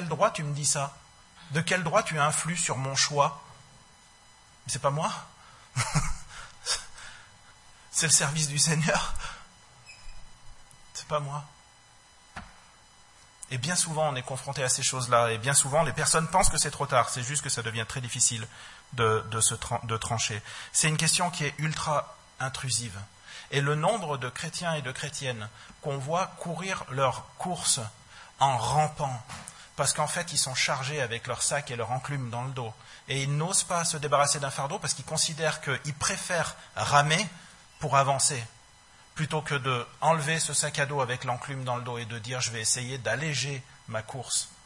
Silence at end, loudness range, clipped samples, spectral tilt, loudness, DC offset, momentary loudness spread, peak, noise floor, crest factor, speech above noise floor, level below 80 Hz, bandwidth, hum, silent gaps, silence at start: 0.1 s; 7 LU; under 0.1%; -3 dB/octave; -27 LUFS; under 0.1%; 15 LU; -6 dBFS; -56 dBFS; 24 dB; 28 dB; -50 dBFS; 11.5 kHz; none; none; 0 s